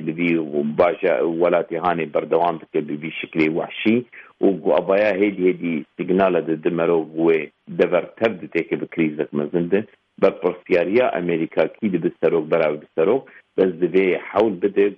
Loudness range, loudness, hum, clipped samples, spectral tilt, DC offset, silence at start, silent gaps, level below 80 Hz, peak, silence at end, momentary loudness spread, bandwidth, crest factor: 2 LU; -20 LUFS; none; under 0.1%; -9 dB/octave; under 0.1%; 0 s; none; -62 dBFS; -4 dBFS; 0 s; 7 LU; 5.8 kHz; 16 dB